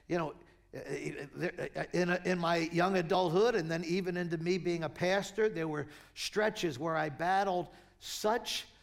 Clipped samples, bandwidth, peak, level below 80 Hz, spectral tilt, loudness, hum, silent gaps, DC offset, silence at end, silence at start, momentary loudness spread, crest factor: under 0.1%; 16.5 kHz; -18 dBFS; -64 dBFS; -5 dB/octave; -33 LUFS; none; none; under 0.1%; 0.15 s; 0.1 s; 11 LU; 16 dB